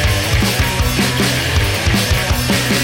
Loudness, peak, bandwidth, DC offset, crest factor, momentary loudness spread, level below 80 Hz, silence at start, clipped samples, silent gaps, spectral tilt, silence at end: -15 LUFS; -4 dBFS; 17 kHz; under 0.1%; 12 dB; 1 LU; -22 dBFS; 0 s; under 0.1%; none; -4 dB/octave; 0 s